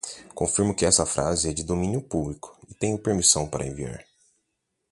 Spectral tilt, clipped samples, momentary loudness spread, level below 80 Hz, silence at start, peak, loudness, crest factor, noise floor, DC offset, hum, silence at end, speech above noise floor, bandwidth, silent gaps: -3.5 dB/octave; under 0.1%; 17 LU; -44 dBFS; 0.05 s; -4 dBFS; -24 LUFS; 22 dB; -78 dBFS; under 0.1%; none; 0.9 s; 53 dB; 11.5 kHz; none